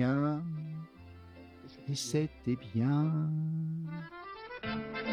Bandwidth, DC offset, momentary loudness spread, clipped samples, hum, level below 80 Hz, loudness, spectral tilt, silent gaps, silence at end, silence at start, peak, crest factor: 13 kHz; under 0.1%; 22 LU; under 0.1%; none; -62 dBFS; -35 LUFS; -6.5 dB/octave; none; 0 s; 0 s; -18 dBFS; 16 dB